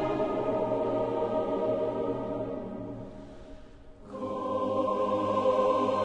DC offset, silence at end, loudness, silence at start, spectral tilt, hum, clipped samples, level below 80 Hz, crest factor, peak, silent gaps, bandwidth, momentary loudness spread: under 0.1%; 0 s; -30 LUFS; 0 s; -7.5 dB/octave; none; under 0.1%; -54 dBFS; 14 dB; -16 dBFS; none; 9.8 kHz; 18 LU